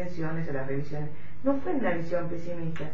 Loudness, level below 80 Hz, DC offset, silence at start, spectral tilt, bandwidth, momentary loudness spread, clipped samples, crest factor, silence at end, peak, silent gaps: -32 LUFS; -56 dBFS; 5%; 0 s; -8.5 dB/octave; 7.6 kHz; 8 LU; under 0.1%; 18 dB; 0 s; -14 dBFS; none